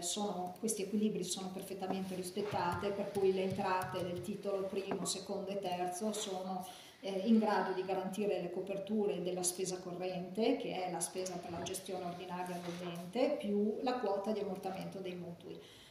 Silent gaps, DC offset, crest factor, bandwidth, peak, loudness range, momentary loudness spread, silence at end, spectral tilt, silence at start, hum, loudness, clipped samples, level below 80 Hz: none; under 0.1%; 18 dB; 15.5 kHz; -20 dBFS; 3 LU; 9 LU; 0 s; -4.5 dB/octave; 0 s; none; -38 LUFS; under 0.1%; -74 dBFS